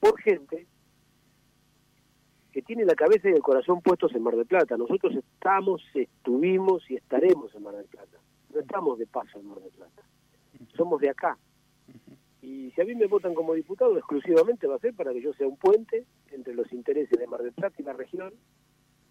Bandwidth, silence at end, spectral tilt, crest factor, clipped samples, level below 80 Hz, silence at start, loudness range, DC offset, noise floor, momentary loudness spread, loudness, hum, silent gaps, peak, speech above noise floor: 11 kHz; 0.8 s; -7 dB/octave; 18 dB; under 0.1%; -72 dBFS; 0 s; 9 LU; under 0.1%; -65 dBFS; 18 LU; -26 LUFS; 60 Hz at -65 dBFS; none; -8 dBFS; 39 dB